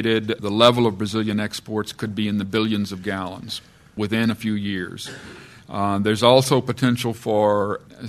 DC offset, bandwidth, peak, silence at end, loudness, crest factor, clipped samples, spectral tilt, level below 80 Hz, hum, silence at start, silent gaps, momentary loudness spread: under 0.1%; 13.5 kHz; 0 dBFS; 0 s; -21 LUFS; 22 dB; under 0.1%; -5.5 dB/octave; -56 dBFS; none; 0 s; none; 16 LU